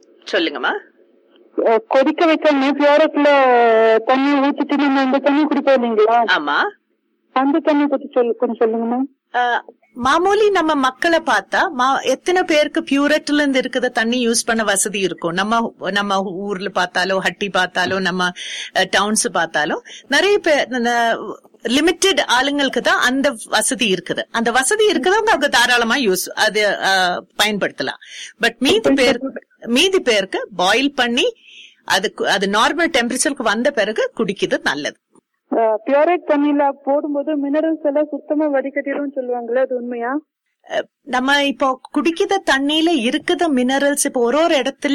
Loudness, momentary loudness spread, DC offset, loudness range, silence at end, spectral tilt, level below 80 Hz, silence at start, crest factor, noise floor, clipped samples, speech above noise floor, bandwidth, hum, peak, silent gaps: -17 LUFS; 8 LU; under 0.1%; 5 LU; 0 s; -2.5 dB/octave; -54 dBFS; 0.25 s; 14 dB; -66 dBFS; under 0.1%; 49 dB; 16 kHz; none; -2 dBFS; none